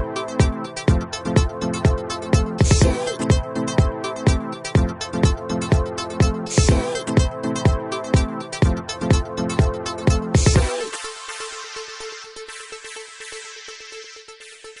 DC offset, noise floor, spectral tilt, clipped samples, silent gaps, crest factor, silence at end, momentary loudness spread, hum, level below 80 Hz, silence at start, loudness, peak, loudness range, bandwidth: under 0.1%; -42 dBFS; -5.5 dB/octave; under 0.1%; none; 18 dB; 0 s; 17 LU; none; -26 dBFS; 0 s; -21 LUFS; -4 dBFS; 10 LU; 11 kHz